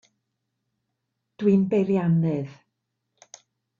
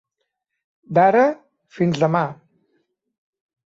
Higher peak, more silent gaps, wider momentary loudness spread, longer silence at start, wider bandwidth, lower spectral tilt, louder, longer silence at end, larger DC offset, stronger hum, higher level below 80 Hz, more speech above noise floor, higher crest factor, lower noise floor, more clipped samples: second, -10 dBFS vs -4 dBFS; neither; about the same, 9 LU vs 11 LU; first, 1.4 s vs 0.9 s; about the same, 7.2 kHz vs 7.8 kHz; first, -9 dB/octave vs -7.5 dB/octave; second, -23 LUFS vs -19 LUFS; second, 1.25 s vs 1.45 s; neither; neither; about the same, -68 dBFS vs -64 dBFS; about the same, 58 dB vs 60 dB; about the same, 18 dB vs 18 dB; about the same, -80 dBFS vs -78 dBFS; neither